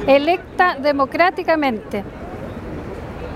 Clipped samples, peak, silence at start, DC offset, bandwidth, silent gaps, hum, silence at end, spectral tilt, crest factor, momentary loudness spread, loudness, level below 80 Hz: under 0.1%; 0 dBFS; 0 s; under 0.1%; 14.5 kHz; none; none; 0 s; -6.5 dB/octave; 18 dB; 15 LU; -18 LUFS; -40 dBFS